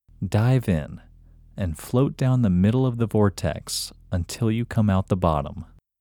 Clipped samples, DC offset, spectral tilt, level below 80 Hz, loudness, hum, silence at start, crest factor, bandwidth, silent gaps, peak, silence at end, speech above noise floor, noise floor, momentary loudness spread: under 0.1%; under 0.1%; -7 dB/octave; -42 dBFS; -23 LUFS; none; 0.2 s; 18 dB; 19 kHz; none; -4 dBFS; 0.35 s; 28 dB; -50 dBFS; 10 LU